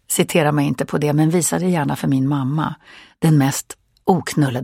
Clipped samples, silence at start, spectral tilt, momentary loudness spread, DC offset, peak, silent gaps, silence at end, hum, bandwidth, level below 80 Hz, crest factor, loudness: under 0.1%; 0.1 s; -5.5 dB/octave; 8 LU; under 0.1%; 0 dBFS; none; 0 s; none; 16.5 kHz; -54 dBFS; 18 dB; -18 LUFS